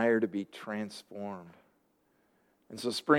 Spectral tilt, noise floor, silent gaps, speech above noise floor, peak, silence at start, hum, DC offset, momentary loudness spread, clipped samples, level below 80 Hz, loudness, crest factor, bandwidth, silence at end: -5 dB/octave; -72 dBFS; none; 40 dB; -10 dBFS; 0 s; none; under 0.1%; 17 LU; under 0.1%; -82 dBFS; -36 LUFS; 24 dB; 16 kHz; 0 s